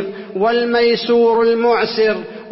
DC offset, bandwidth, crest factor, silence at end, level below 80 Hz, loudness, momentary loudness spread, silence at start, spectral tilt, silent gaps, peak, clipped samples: under 0.1%; 5.8 kHz; 10 dB; 0 s; -56 dBFS; -15 LUFS; 6 LU; 0 s; -8 dB/octave; none; -4 dBFS; under 0.1%